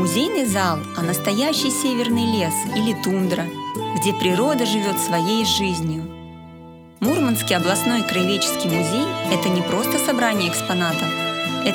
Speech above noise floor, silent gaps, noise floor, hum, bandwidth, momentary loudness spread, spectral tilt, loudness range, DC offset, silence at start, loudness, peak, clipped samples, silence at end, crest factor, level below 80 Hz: 21 dB; none; -41 dBFS; none; over 20 kHz; 6 LU; -4 dB/octave; 2 LU; under 0.1%; 0 s; -20 LUFS; -2 dBFS; under 0.1%; 0 s; 18 dB; -54 dBFS